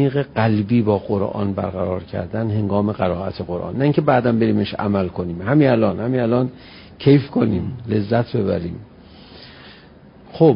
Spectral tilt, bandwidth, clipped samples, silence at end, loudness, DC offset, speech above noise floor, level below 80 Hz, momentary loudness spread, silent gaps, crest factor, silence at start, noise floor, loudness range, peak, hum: -13 dB/octave; 5.4 kHz; under 0.1%; 0 s; -19 LUFS; under 0.1%; 26 dB; -44 dBFS; 10 LU; none; 18 dB; 0 s; -45 dBFS; 3 LU; -2 dBFS; none